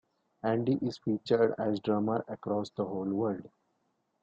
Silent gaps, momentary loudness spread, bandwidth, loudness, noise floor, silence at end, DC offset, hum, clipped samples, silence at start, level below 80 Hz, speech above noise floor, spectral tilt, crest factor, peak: none; 7 LU; 7.8 kHz; -32 LUFS; -77 dBFS; 0.75 s; under 0.1%; none; under 0.1%; 0.45 s; -70 dBFS; 46 dB; -8 dB/octave; 18 dB; -14 dBFS